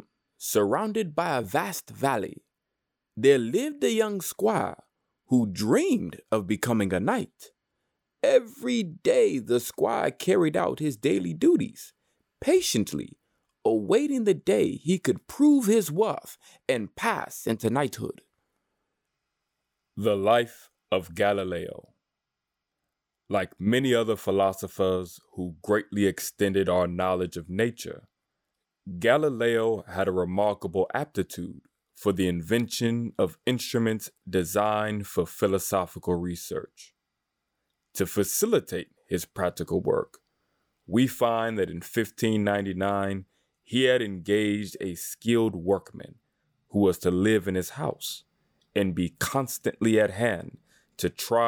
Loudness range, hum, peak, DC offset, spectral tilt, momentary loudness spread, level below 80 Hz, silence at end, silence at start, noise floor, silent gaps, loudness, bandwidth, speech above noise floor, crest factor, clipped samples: 5 LU; none; -8 dBFS; under 0.1%; -5 dB/octave; 12 LU; -64 dBFS; 0 s; 0.4 s; -86 dBFS; none; -26 LUFS; over 20 kHz; 60 dB; 20 dB; under 0.1%